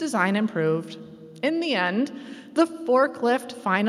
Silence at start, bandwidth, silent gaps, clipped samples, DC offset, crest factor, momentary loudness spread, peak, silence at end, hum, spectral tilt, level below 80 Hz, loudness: 0 s; 13 kHz; none; under 0.1%; under 0.1%; 18 dB; 14 LU; -6 dBFS; 0 s; none; -5.5 dB/octave; -76 dBFS; -24 LUFS